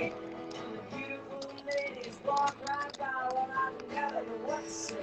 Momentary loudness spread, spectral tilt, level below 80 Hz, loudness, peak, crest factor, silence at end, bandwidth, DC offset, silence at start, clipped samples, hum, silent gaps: 10 LU; -3 dB/octave; -70 dBFS; -36 LUFS; -18 dBFS; 16 dB; 0 s; 10.5 kHz; under 0.1%; 0 s; under 0.1%; none; none